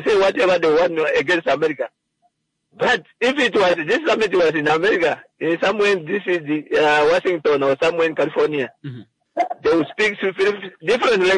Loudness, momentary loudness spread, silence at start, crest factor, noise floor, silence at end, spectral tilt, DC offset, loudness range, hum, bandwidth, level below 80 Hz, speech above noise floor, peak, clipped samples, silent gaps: -18 LUFS; 8 LU; 0 s; 12 dB; -67 dBFS; 0 s; -4.5 dB/octave; under 0.1%; 2 LU; none; 10.5 kHz; -56 dBFS; 48 dB; -6 dBFS; under 0.1%; none